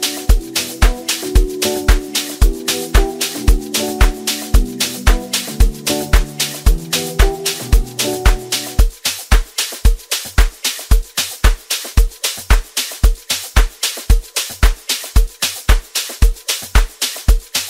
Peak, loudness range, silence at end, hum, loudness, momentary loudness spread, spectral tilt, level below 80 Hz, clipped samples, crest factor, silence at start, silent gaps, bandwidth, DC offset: 0 dBFS; 1 LU; 0 s; none; -17 LUFS; 4 LU; -3 dB/octave; -16 dBFS; under 0.1%; 14 dB; 0 s; none; 16.5 kHz; under 0.1%